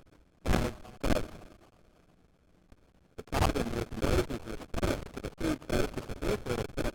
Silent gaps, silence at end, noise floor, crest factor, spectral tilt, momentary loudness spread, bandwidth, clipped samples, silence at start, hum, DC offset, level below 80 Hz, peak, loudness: none; 0 s; -64 dBFS; 20 dB; -5.5 dB/octave; 10 LU; 19 kHz; under 0.1%; 0.45 s; none; under 0.1%; -40 dBFS; -14 dBFS; -34 LUFS